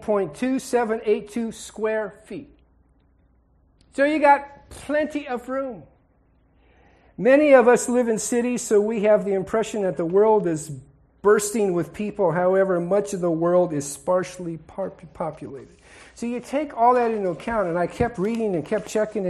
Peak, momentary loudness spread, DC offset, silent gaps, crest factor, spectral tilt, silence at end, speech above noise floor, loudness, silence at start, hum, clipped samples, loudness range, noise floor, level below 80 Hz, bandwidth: -2 dBFS; 15 LU; under 0.1%; none; 20 dB; -5.5 dB/octave; 0 s; 39 dB; -22 LUFS; 0 s; none; under 0.1%; 7 LU; -60 dBFS; -54 dBFS; 13 kHz